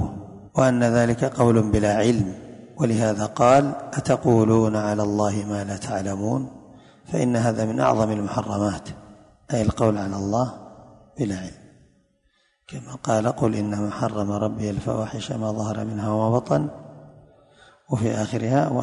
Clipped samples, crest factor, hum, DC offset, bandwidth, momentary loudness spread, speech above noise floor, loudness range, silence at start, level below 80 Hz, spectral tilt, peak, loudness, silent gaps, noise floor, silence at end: under 0.1%; 18 dB; none; under 0.1%; 11 kHz; 12 LU; 44 dB; 7 LU; 0 s; -46 dBFS; -7 dB/octave; -4 dBFS; -23 LUFS; none; -66 dBFS; 0 s